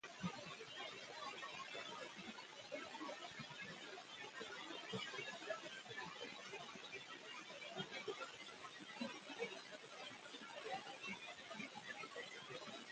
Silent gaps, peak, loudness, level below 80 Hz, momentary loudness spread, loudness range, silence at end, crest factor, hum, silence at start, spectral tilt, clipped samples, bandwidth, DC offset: none; -32 dBFS; -51 LUFS; -88 dBFS; 5 LU; 1 LU; 0 s; 20 dB; none; 0.05 s; -3 dB/octave; under 0.1%; 9.4 kHz; under 0.1%